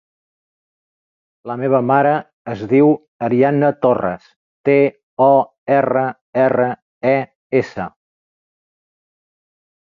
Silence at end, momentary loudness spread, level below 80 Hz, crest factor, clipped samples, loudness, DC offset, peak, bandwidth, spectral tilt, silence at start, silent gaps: 2 s; 13 LU; -60 dBFS; 16 dB; under 0.1%; -16 LUFS; under 0.1%; -2 dBFS; 7 kHz; -9 dB/octave; 1.45 s; 2.33-2.45 s, 3.08-3.20 s, 4.36-4.64 s, 5.03-5.17 s, 5.58-5.66 s, 6.21-6.33 s, 6.82-7.01 s, 7.36-7.50 s